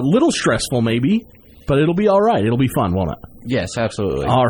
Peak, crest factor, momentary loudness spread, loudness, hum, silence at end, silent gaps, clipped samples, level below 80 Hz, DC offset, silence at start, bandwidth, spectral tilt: -4 dBFS; 14 dB; 8 LU; -18 LUFS; none; 0 s; none; under 0.1%; -40 dBFS; under 0.1%; 0 s; 19 kHz; -6 dB/octave